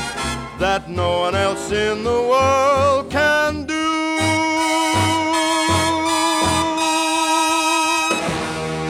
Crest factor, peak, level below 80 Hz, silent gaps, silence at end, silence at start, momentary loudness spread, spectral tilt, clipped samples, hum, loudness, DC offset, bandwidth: 12 dB; -6 dBFS; -42 dBFS; none; 0 s; 0 s; 5 LU; -3.5 dB/octave; under 0.1%; none; -18 LUFS; under 0.1%; 17 kHz